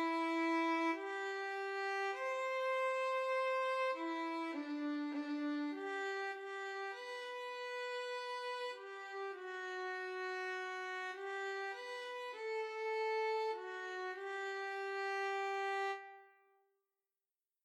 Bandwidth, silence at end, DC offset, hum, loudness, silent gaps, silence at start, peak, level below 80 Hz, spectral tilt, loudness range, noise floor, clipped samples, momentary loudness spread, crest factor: 13 kHz; 1.35 s; under 0.1%; none; -40 LUFS; none; 0 s; -28 dBFS; under -90 dBFS; -1 dB/octave; 5 LU; under -90 dBFS; under 0.1%; 8 LU; 14 dB